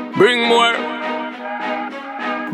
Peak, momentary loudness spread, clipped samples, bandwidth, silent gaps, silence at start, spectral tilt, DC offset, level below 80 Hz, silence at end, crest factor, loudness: 0 dBFS; 12 LU; under 0.1%; 12.5 kHz; none; 0 s; -4 dB/octave; under 0.1%; -78 dBFS; 0 s; 18 dB; -18 LUFS